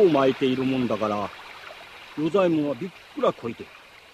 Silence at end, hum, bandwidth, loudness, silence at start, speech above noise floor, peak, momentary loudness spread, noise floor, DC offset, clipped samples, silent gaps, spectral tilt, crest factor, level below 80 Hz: 0.45 s; none; 13.5 kHz; -25 LUFS; 0 s; 20 dB; -8 dBFS; 19 LU; -43 dBFS; under 0.1%; under 0.1%; none; -7 dB/octave; 16 dB; -62 dBFS